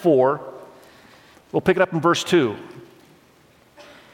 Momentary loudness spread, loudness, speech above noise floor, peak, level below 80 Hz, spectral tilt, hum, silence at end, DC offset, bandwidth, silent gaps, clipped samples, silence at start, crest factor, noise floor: 21 LU; -20 LUFS; 35 dB; -4 dBFS; -60 dBFS; -5.5 dB/octave; none; 1.3 s; under 0.1%; 16 kHz; none; under 0.1%; 0 s; 20 dB; -54 dBFS